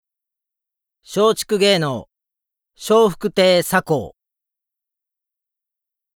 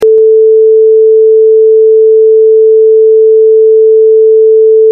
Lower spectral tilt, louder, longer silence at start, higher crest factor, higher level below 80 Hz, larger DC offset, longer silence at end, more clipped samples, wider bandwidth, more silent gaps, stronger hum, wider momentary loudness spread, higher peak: second, -4 dB/octave vs -6.5 dB/octave; second, -17 LUFS vs -4 LUFS; first, 1.1 s vs 0 s; first, 18 dB vs 4 dB; first, -56 dBFS vs -62 dBFS; neither; first, 2.05 s vs 0 s; neither; first, 19 kHz vs 0.9 kHz; neither; neither; first, 13 LU vs 0 LU; about the same, -2 dBFS vs 0 dBFS